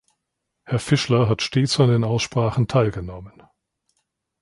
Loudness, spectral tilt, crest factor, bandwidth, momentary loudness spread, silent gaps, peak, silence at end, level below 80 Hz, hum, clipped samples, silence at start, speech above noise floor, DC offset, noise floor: -20 LUFS; -6 dB/octave; 18 dB; 11.5 kHz; 11 LU; none; -4 dBFS; 1.15 s; -48 dBFS; none; under 0.1%; 0.7 s; 59 dB; under 0.1%; -79 dBFS